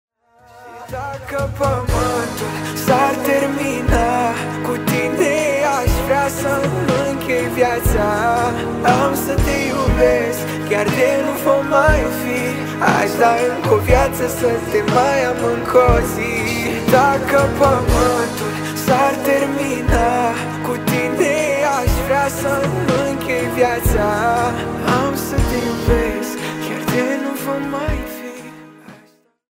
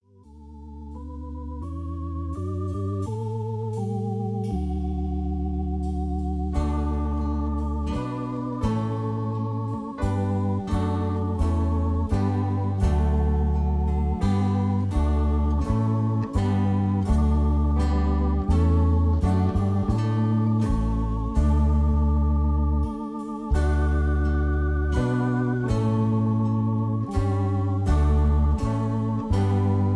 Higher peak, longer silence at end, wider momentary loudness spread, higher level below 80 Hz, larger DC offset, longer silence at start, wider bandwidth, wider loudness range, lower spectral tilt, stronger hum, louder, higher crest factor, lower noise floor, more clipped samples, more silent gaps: first, 0 dBFS vs -10 dBFS; first, 0.6 s vs 0 s; about the same, 8 LU vs 8 LU; about the same, -28 dBFS vs -26 dBFS; first, 0.1% vs under 0.1%; first, 0.55 s vs 0.3 s; first, 16.5 kHz vs 9.8 kHz; about the same, 4 LU vs 6 LU; second, -5.5 dB/octave vs -9 dB/octave; neither; first, -17 LUFS vs -25 LUFS; about the same, 16 dB vs 12 dB; first, -52 dBFS vs -47 dBFS; neither; neither